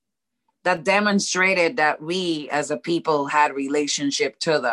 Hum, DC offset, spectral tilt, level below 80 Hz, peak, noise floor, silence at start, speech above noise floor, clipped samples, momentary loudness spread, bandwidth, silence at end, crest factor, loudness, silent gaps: none; under 0.1%; -3.5 dB/octave; -70 dBFS; -4 dBFS; -75 dBFS; 0.65 s; 54 dB; under 0.1%; 6 LU; 12 kHz; 0 s; 18 dB; -21 LUFS; none